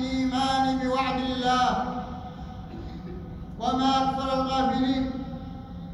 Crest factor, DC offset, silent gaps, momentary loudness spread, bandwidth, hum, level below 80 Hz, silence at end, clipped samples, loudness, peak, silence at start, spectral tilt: 16 dB; under 0.1%; none; 16 LU; 11.5 kHz; none; -44 dBFS; 0 s; under 0.1%; -26 LUFS; -10 dBFS; 0 s; -5.5 dB/octave